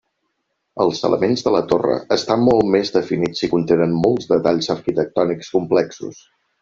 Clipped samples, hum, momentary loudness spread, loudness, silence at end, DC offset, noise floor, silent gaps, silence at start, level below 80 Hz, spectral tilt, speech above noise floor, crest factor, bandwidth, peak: under 0.1%; none; 5 LU; -18 LUFS; 0.5 s; under 0.1%; -73 dBFS; none; 0.75 s; -52 dBFS; -6 dB/octave; 55 dB; 16 dB; 7.6 kHz; -2 dBFS